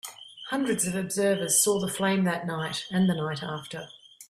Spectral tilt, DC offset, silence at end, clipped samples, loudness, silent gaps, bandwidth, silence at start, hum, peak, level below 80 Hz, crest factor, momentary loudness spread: -4 dB/octave; under 0.1%; 0.05 s; under 0.1%; -26 LUFS; none; 15 kHz; 0.05 s; none; -10 dBFS; -64 dBFS; 18 dB; 18 LU